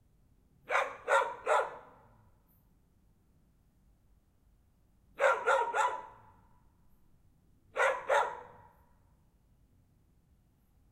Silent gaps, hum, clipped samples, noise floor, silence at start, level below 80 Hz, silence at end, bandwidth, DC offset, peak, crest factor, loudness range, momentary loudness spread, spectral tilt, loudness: none; none; under 0.1%; -68 dBFS; 0.7 s; -70 dBFS; 2.45 s; 15 kHz; under 0.1%; -14 dBFS; 22 dB; 5 LU; 14 LU; -1.5 dB/octave; -31 LUFS